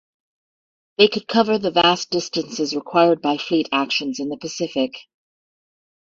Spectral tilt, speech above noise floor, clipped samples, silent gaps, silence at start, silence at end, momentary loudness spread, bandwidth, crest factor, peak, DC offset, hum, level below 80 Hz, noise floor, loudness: -4 dB/octave; over 70 dB; under 0.1%; none; 1 s; 1.15 s; 10 LU; 7.8 kHz; 20 dB; -2 dBFS; under 0.1%; none; -64 dBFS; under -90 dBFS; -20 LUFS